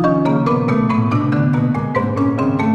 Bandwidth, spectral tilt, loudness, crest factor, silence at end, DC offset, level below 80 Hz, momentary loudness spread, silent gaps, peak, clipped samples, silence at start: 8 kHz; -9.5 dB/octave; -16 LUFS; 12 dB; 0 s; under 0.1%; -46 dBFS; 2 LU; none; -4 dBFS; under 0.1%; 0 s